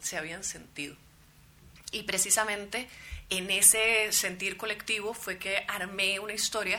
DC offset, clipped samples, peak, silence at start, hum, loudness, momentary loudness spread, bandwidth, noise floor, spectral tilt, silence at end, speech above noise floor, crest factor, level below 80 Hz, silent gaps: under 0.1%; under 0.1%; -6 dBFS; 0 s; none; -27 LUFS; 19 LU; over 20 kHz; -58 dBFS; 0 dB/octave; 0 s; 28 dB; 26 dB; -56 dBFS; none